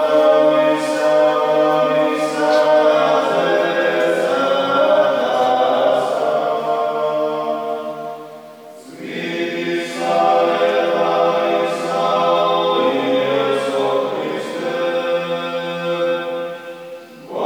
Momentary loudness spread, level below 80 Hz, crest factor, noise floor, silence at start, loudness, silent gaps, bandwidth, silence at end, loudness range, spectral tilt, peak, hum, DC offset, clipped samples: 12 LU; -78 dBFS; 14 dB; -38 dBFS; 0 s; -17 LUFS; none; 19 kHz; 0 s; 7 LU; -4.5 dB/octave; -2 dBFS; none; under 0.1%; under 0.1%